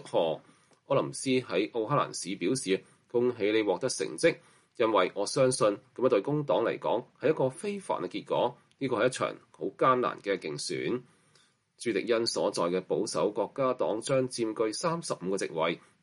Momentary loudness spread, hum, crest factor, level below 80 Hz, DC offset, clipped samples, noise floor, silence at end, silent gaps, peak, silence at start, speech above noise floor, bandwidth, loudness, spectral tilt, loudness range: 7 LU; none; 18 dB; -76 dBFS; under 0.1%; under 0.1%; -66 dBFS; 0.25 s; none; -12 dBFS; 0 s; 37 dB; 11.5 kHz; -30 LUFS; -4.5 dB/octave; 3 LU